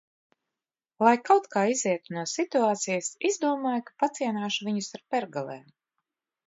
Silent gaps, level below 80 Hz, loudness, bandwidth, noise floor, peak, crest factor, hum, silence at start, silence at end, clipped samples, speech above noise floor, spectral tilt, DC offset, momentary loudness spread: none; -80 dBFS; -27 LUFS; 8 kHz; under -90 dBFS; -8 dBFS; 20 dB; none; 1 s; 0.9 s; under 0.1%; over 63 dB; -3.5 dB/octave; under 0.1%; 9 LU